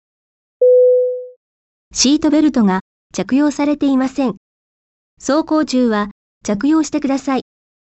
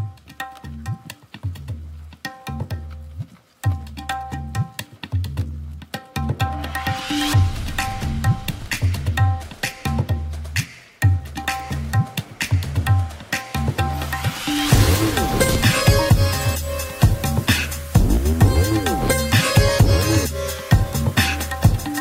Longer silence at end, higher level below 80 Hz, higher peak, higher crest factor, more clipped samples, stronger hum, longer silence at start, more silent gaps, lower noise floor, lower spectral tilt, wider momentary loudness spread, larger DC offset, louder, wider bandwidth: first, 0.55 s vs 0 s; second, -50 dBFS vs -28 dBFS; about the same, -2 dBFS vs -2 dBFS; about the same, 14 dB vs 18 dB; neither; neither; first, 0.6 s vs 0 s; first, 1.36-1.91 s, 2.81-3.10 s, 4.37-5.17 s, 6.11-6.41 s vs none; first, under -90 dBFS vs -39 dBFS; about the same, -4.5 dB/octave vs -5 dB/octave; second, 13 LU vs 17 LU; neither; first, -15 LUFS vs -20 LUFS; second, 8.4 kHz vs 16.5 kHz